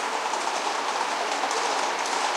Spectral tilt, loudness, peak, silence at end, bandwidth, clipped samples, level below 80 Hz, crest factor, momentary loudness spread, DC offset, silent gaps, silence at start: 0.5 dB/octave; -26 LUFS; -12 dBFS; 0 s; 16.5 kHz; under 0.1%; -84 dBFS; 14 dB; 2 LU; under 0.1%; none; 0 s